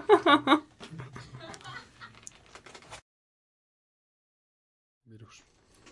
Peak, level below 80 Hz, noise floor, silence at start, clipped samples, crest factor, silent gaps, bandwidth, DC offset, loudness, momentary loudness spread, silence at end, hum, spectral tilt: -8 dBFS; -68 dBFS; -61 dBFS; 0.1 s; under 0.1%; 24 dB; none; 11.5 kHz; under 0.1%; -23 LUFS; 28 LU; 2.95 s; none; -4.5 dB/octave